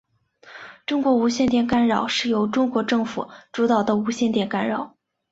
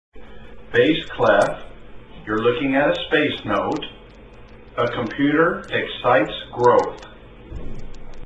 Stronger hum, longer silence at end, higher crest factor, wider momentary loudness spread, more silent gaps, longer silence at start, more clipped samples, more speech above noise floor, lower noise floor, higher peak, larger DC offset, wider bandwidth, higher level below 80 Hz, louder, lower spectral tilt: neither; first, 0.45 s vs 0 s; about the same, 16 dB vs 18 dB; second, 13 LU vs 20 LU; neither; first, 0.45 s vs 0.15 s; neither; first, 30 dB vs 23 dB; first, -51 dBFS vs -42 dBFS; about the same, -6 dBFS vs -4 dBFS; neither; second, 8 kHz vs 10.5 kHz; second, -56 dBFS vs -40 dBFS; about the same, -22 LUFS vs -20 LUFS; about the same, -5 dB/octave vs -6 dB/octave